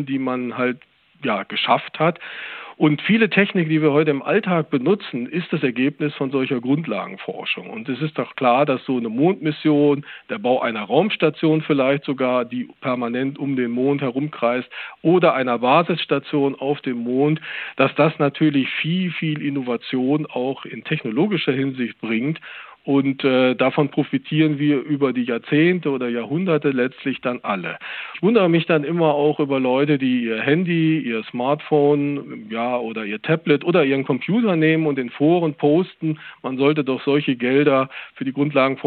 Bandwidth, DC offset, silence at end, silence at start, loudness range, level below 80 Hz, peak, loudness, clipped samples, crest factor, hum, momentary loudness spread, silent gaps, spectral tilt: 4.5 kHz; under 0.1%; 0 s; 0 s; 3 LU; -76 dBFS; -2 dBFS; -20 LUFS; under 0.1%; 18 dB; none; 9 LU; none; -10.5 dB/octave